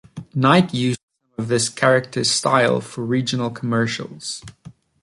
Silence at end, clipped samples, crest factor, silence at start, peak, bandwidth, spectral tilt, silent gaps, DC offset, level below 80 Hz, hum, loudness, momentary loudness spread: 0.3 s; under 0.1%; 18 dB; 0.15 s; -2 dBFS; 11.5 kHz; -4.5 dB/octave; 1.03-1.08 s; under 0.1%; -58 dBFS; none; -19 LUFS; 14 LU